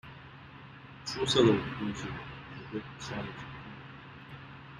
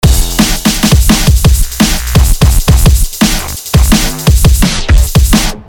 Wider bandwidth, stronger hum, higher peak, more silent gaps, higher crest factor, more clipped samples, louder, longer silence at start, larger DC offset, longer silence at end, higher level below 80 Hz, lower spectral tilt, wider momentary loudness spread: second, 11 kHz vs over 20 kHz; neither; second, -10 dBFS vs 0 dBFS; neither; first, 24 dB vs 8 dB; second, under 0.1% vs 2%; second, -32 LUFS vs -9 LUFS; about the same, 0.05 s vs 0 s; neither; about the same, 0 s vs 0.05 s; second, -58 dBFS vs -10 dBFS; about the same, -5 dB/octave vs -4.5 dB/octave; first, 24 LU vs 3 LU